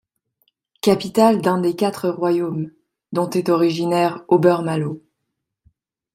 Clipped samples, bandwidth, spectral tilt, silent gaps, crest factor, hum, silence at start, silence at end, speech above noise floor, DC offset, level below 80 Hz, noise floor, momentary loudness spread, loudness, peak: under 0.1%; 15.5 kHz; -6.5 dB/octave; none; 18 dB; none; 0.85 s; 1.15 s; 60 dB; under 0.1%; -62 dBFS; -78 dBFS; 11 LU; -19 LUFS; -2 dBFS